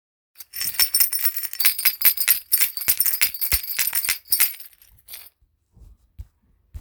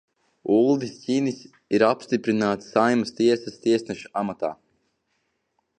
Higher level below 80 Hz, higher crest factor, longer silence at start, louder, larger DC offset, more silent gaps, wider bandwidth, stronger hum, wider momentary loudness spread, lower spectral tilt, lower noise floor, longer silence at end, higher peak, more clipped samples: first, -46 dBFS vs -68 dBFS; about the same, 24 dB vs 20 dB; about the same, 0.4 s vs 0.45 s; first, -18 LUFS vs -23 LUFS; neither; neither; first, over 20 kHz vs 9.6 kHz; neither; first, 20 LU vs 10 LU; second, 2 dB/octave vs -6 dB/octave; second, -61 dBFS vs -73 dBFS; second, 0 s vs 1.25 s; first, 0 dBFS vs -4 dBFS; neither